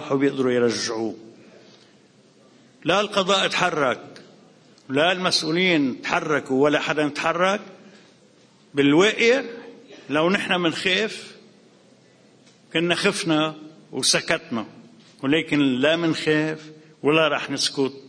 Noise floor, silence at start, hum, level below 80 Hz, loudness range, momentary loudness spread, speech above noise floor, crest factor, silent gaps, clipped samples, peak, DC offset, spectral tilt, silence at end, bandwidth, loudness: -54 dBFS; 0 s; none; -66 dBFS; 3 LU; 11 LU; 33 dB; 22 dB; none; under 0.1%; -2 dBFS; under 0.1%; -4 dB/octave; 0 s; 10.5 kHz; -21 LUFS